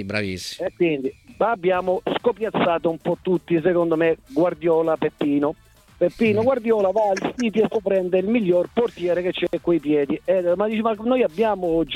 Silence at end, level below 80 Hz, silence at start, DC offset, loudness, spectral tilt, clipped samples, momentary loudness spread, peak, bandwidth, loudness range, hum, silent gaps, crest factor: 0 s; -54 dBFS; 0 s; under 0.1%; -21 LUFS; -6.5 dB/octave; under 0.1%; 5 LU; -6 dBFS; 13 kHz; 1 LU; none; none; 16 dB